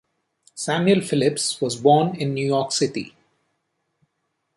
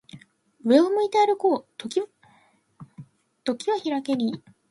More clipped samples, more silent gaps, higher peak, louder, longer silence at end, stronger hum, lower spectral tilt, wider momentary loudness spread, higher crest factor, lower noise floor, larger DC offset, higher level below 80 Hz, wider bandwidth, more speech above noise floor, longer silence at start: neither; neither; about the same, -4 dBFS vs -6 dBFS; first, -21 LUFS vs -24 LUFS; first, 1.5 s vs 0.35 s; neither; about the same, -4.5 dB/octave vs -5 dB/octave; about the same, 14 LU vs 13 LU; about the same, 20 dB vs 20 dB; first, -75 dBFS vs -61 dBFS; neither; first, -66 dBFS vs -74 dBFS; about the same, 11.5 kHz vs 11.5 kHz; first, 55 dB vs 39 dB; first, 0.55 s vs 0.15 s